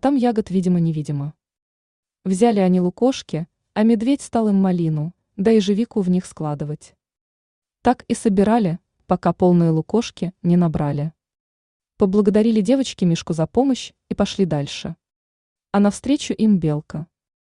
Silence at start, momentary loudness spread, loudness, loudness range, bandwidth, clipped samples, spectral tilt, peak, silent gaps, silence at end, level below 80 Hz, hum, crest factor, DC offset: 0.05 s; 12 LU; -20 LUFS; 3 LU; 11 kHz; under 0.1%; -7 dB/octave; -4 dBFS; 1.62-2.03 s, 7.21-7.62 s, 11.40-11.80 s, 15.16-15.56 s; 0.55 s; -50 dBFS; none; 16 dB; under 0.1%